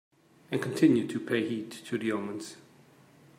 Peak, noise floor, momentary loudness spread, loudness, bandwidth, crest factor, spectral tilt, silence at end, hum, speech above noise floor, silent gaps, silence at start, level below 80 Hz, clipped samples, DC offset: -10 dBFS; -58 dBFS; 14 LU; -30 LUFS; 15.5 kHz; 20 dB; -6 dB/octave; 0.8 s; none; 29 dB; none; 0.5 s; -76 dBFS; under 0.1%; under 0.1%